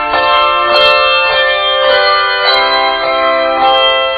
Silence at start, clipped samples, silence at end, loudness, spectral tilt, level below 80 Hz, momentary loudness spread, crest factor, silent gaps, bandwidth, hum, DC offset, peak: 0 s; under 0.1%; 0 s; -9 LUFS; -3 dB/octave; -42 dBFS; 4 LU; 10 dB; none; 9 kHz; none; under 0.1%; 0 dBFS